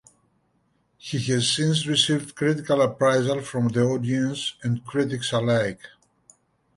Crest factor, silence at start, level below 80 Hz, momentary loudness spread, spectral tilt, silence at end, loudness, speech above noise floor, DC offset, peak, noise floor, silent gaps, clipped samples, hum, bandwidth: 18 dB; 1.05 s; -60 dBFS; 9 LU; -5 dB/octave; 0.9 s; -23 LUFS; 45 dB; under 0.1%; -6 dBFS; -68 dBFS; none; under 0.1%; none; 11.5 kHz